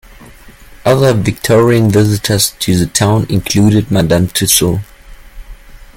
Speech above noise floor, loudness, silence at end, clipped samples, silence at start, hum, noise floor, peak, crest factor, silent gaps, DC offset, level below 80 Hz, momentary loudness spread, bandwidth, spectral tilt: 26 dB; -11 LUFS; 0.15 s; under 0.1%; 0.2 s; none; -36 dBFS; 0 dBFS; 12 dB; none; under 0.1%; -34 dBFS; 4 LU; 17 kHz; -5 dB/octave